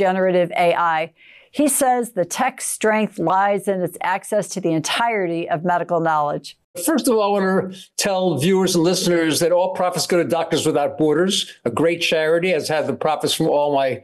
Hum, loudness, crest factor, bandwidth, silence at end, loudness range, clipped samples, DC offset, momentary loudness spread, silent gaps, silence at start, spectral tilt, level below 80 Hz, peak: none; -19 LUFS; 12 dB; 15.5 kHz; 0.05 s; 2 LU; under 0.1%; under 0.1%; 6 LU; 6.64-6.74 s; 0 s; -4 dB/octave; -62 dBFS; -8 dBFS